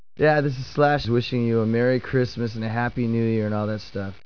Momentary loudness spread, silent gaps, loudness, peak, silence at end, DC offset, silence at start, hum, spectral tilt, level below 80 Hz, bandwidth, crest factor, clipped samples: 7 LU; none; -23 LUFS; -6 dBFS; 0.1 s; 0.7%; 0.2 s; none; -8 dB/octave; -50 dBFS; 5.4 kHz; 16 dB; under 0.1%